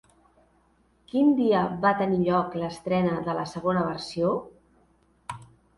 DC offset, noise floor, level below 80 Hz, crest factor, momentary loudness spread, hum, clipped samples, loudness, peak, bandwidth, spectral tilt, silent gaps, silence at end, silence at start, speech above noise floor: under 0.1%; -64 dBFS; -58 dBFS; 18 dB; 19 LU; none; under 0.1%; -25 LUFS; -10 dBFS; 11.5 kHz; -7 dB/octave; none; 0.35 s; 1.15 s; 40 dB